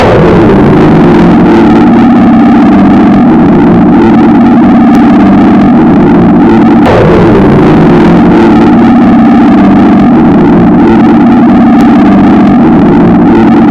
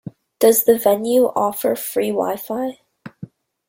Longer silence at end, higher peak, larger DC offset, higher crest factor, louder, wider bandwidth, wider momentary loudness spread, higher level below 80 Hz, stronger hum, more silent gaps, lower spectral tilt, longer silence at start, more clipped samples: second, 0 s vs 0.45 s; about the same, 0 dBFS vs -2 dBFS; neither; second, 2 dB vs 18 dB; first, -2 LUFS vs -18 LUFS; second, 7 kHz vs 17 kHz; second, 1 LU vs 16 LU; first, -22 dBFS vs -62 dBFS; neither; neither; first, -9 dB/octave vs -4 dB/octave; about the same, 0 s vs 0.05 s; first, 10% vs under 0.1%